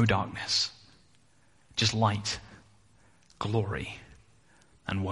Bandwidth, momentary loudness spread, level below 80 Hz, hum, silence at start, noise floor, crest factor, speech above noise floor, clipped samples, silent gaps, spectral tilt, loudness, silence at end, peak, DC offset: 11.5 kHz; 13 LU; -56 dBFS; none; 0 s; -65 dBFS; 22 dB; 36 dB; under 0.1%; none; -4 dB/octave; -30 LUFS; 0 s; -10 dBFS; under 0.1%